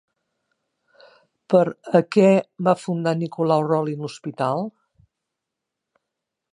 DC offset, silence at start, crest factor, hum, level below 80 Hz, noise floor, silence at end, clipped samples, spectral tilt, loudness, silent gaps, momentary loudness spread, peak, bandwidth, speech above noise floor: under 0.1%; 1.5 s; 20 dB; none; -72 dBFS; -83 dBFS; 1.85 s; under 0.1%; -7.5 dB/octave; -21 LUFS; none; 12 LU; -2 dBFS; 11 kHz; 63 dB